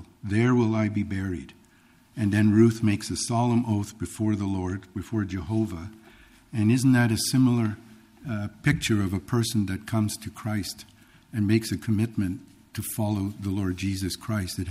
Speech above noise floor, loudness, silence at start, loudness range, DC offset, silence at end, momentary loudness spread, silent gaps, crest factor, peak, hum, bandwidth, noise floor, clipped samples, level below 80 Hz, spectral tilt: 33 dB; -26 LUFS; 0 s; 4 LU; under 0.1%; 0 s; 14 LU; none; 18 dB; -8 dBFS; none; 15.5 kHz; -58 dBFS; under 0.1%; -52 dBFS; -6 dB/octave